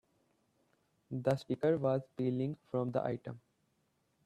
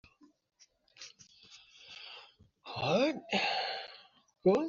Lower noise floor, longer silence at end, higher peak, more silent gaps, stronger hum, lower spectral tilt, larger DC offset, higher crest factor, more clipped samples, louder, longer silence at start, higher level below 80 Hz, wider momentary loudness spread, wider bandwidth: first, -78 dBFS vs -60 dBFS; first, 0.85 s vs 0 s; about the same, -16 dBFS vs -16 dBFS; neither; neither; first, -8.5 dB/octave vs -3 dB/octave; neither; about the same, 22 dB vs 20 dB; neither; second, -36 LUFS vs -33 LUFS; about the same, 1.1 s vs 1 s; about the same, -74 dBFS vs -74 dBFS; second, 12 LU vs 24 LU; first, 12 kHz vs 7.2 kHz